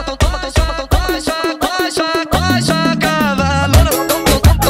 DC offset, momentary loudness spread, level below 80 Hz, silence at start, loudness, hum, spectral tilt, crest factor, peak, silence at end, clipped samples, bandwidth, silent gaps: under 0.1%; 6 LU; -20 dBFS; 0 s; -14 LUFS; none; -4.5 dB/octave; 14 dB; 0 dBFS; 0 s; under 0.1%; 16.5 kHz; none